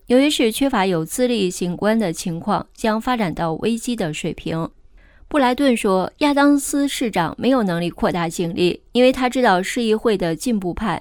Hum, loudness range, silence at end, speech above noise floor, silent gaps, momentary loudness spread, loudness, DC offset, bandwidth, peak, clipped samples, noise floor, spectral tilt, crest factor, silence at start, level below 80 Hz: none; 3 LU; 0 s; 28 dB; none; 7 LU; -19 LUFS; under 0.1%; 19 kHz; -4 dBFS; under 0.1%; -47 dBFS; -5 dB/octave; 16 dB; 0.1 s; -44 dBFS